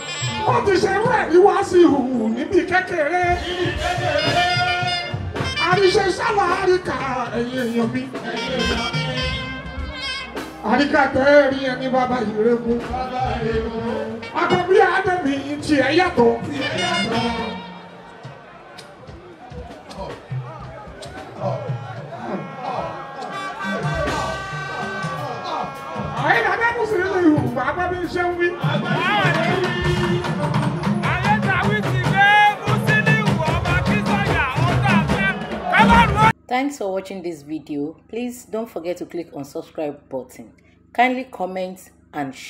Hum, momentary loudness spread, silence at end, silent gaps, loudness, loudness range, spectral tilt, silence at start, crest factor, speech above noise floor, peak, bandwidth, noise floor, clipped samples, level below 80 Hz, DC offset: none; 16 LU; 0 s; none; -20 LUFS; 12 LU; -5.5 dB/octave; 0 s; 20 dB; 21 dB; 0 dBFS; 15.5 kHz; -40 dBFS; under 0.1%; -40 dBFS; under 0.1%